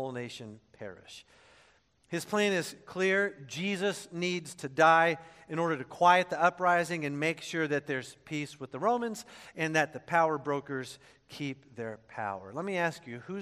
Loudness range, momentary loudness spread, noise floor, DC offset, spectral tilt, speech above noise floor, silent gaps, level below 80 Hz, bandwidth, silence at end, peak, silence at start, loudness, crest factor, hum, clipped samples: 6 LU; 19 LU; -66 dBFS; under 0.1%; -4.5 dB/octave; 34 dB; none; -76 dBFS; 14 kHz; 0 s; -10 dBFS; 0 s; -30 LUFS; 22 dB; none; under 0.1%